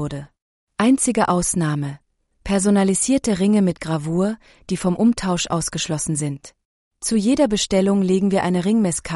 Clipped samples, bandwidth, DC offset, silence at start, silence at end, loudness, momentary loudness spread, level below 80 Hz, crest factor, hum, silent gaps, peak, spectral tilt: under 0.1%; 11.5 kHz; under 0.1%; 0 s; 0 s; -19 LUFS; 11 LU; -44 dBFS; 14 dB; none; 0.42-0.67 s, 6.65-6.91 s; -6 dBFS; -5 dB/octave